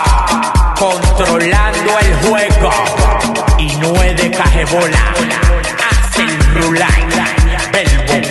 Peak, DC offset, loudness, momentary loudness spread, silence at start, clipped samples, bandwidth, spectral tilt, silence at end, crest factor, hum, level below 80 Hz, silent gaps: 0 dBFS; under 0.1%; -12 LUFS; 2 LU; 0 s; under 0.1%; 12.5 kHz; -4.5 dB/octave; 0 s; 10 dB; none; -14 dBFS; none